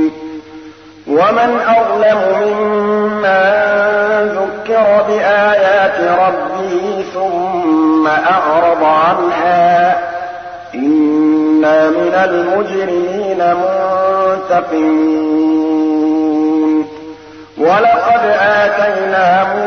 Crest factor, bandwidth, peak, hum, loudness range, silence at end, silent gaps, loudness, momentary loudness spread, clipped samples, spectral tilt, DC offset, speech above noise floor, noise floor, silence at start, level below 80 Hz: 10 dB; 6.4 kHz; -2 dBFS; none; 2 LU; 0 s; none; -12 LUFS; 7 LU; under 0.1%; -6 dB/octave; 0.1%; 23 dB; -35 dBFS; 0 s; -54 dBFS